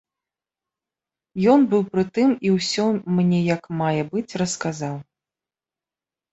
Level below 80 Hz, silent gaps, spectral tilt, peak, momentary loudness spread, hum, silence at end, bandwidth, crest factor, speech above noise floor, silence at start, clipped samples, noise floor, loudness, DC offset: -62 dBFS; none; -6 dB/octave; -4 dBFS; 10 LU; none; 1.3 s; 8.2 kHz; 18 dB; over 70 dB; 1.35 s; under 0.1%; under -90 dBFS; -21 LUFS; under 0.1%